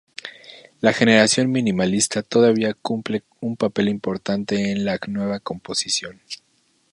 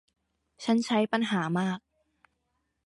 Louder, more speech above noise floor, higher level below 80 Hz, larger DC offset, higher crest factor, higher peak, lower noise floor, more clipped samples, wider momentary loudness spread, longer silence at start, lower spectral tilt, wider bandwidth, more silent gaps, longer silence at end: first, -20 LUFS vs -28 LUFS; second, 25 dB vs 51 dB; first, -58 dBFS vs -74 dBFS; neither; about the same, 20 dB vs 18 dB; first, 0 dBFS vs -14 dBFS; second, -45 dBFS vs -78 dBFS; neither; first, 19 LU vs 9 LU; second, 0.25 s vs 0.6 s; second, -4 dB/octave vs -5.5 dB/octave; about the same, 11.5 kHz vs 11.5 kHz; neither; second, 0.55 s vs 1.1 s